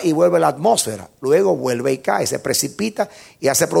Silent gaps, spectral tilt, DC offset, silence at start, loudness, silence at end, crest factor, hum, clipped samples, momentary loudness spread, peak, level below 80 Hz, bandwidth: none; -4 dB/octave; under 0.1%; 0 s; -18 LUFS; 0 s; 16 dB; none; under 0.1%; 9 LU; -2 dBFS; -60 dBFS; 17 kHz